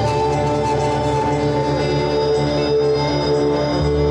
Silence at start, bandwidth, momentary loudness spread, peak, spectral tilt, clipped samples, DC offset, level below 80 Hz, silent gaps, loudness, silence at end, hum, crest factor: 0 s; 10.5 kHz; 1 LU; -8 dBFS; -6.5 dB/octave; under 0.1%; under 0.1%; -32 dBFS; none; -18 LUFS; 0 s; none; 10 dB